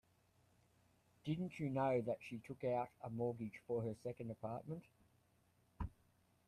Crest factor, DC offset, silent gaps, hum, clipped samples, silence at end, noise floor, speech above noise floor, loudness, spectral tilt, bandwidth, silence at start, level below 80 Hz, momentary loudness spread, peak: 18 dB; under 0.1%; none; none; under 0.1%; 0.6 s; -76 dBFS; 33 dB; -44 LUFS; -8.5 dB/octave; 14 kHz; 1.25 s; -66 dBFS; 13 LU; -28 dBFS